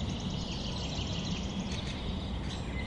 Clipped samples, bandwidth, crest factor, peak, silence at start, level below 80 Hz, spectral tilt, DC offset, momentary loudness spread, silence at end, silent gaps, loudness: under 0.1%; 11 kHz; 12 dB; -22 dBFS; 0 s; -42 dBFS; -5 dB/octave; under 0.1%; 2 LU; 0 s; none; -36 LUFS